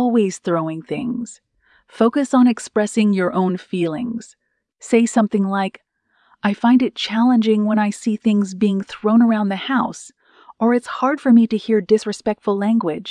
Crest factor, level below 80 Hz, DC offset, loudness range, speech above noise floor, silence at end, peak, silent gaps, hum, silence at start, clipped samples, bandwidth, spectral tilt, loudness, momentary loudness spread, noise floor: 16 dB; -64 dBFS; under 0.1%; 2 LU; 43 dB; 0 s; -2 dBFS; none; none; 0 s; under 0.1%; 10.5 kHz; -6 dB/octave; -18 LUFS; 10 LU; -60 dBFS